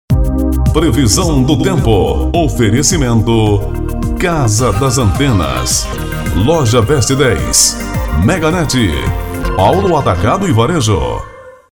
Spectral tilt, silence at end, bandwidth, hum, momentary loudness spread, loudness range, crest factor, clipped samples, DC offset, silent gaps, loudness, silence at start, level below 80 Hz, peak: -5 dB/octave; 0.25 s; 19.5 kHz; none; 8 LU; 2 LU; 12 dB; under 0.1%; under 0.1%; none; -12 LUFS; 0.1 s; -20 dBFS; 0 dBFS